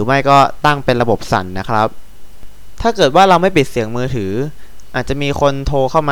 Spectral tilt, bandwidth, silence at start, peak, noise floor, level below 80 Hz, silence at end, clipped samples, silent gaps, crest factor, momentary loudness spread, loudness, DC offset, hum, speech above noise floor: -5.5 dB/octave; 19.5 kHz; 0 s; 0 dBFS; -33 dBFS; -32 dBFS; 0 s; under 0.1%; none; 14 dB; 11 LU; -14 LUFS; 6%; none; 20 dB